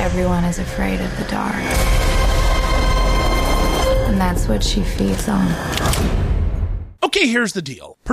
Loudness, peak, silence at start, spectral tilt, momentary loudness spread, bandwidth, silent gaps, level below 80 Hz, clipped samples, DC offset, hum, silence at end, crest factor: -19 LUFS; -4 dBFS; 0 s; -5 dB/octave; 5 LU; 15.5 kHz; none; -20 dBFS; under 0.1%; under 0.1%; none; 0 s; 14 dB